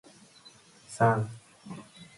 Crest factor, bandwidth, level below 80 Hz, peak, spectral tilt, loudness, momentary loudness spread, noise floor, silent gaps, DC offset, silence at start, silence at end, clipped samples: 22 dB; 11.5 kHz; -66 dBFS; -10 dBFS; -6.5 dB/octave; -28 LUFS; 21 LU; -56 dBFS; none; under 0.1%; 0.9 s; 0.15 s; under 0.1%